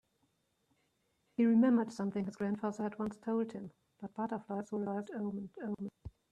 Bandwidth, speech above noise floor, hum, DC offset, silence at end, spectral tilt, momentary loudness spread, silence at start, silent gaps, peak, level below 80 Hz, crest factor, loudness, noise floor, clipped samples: 9.4 kHz; 43 dB; none; under 0.1%; 0.25 s; -8 dB/octave; 18 LU; 1.4 s; none; -18 dBFS; -70 dBFS; 18 dB; -36 LUFS; -78 dBFS; under 0.1%